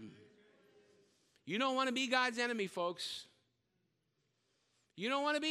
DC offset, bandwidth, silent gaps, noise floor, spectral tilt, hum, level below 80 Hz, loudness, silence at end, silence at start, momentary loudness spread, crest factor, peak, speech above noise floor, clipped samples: under 0.1%; 15.5 kHz; none; -82 dBFS; -3 dB/octave; none; -90 dBFS; -36 LUFS; 0 s; 0 s; 12 LU; 24 dB; -16 dBFS; 46 dB; under 0.1%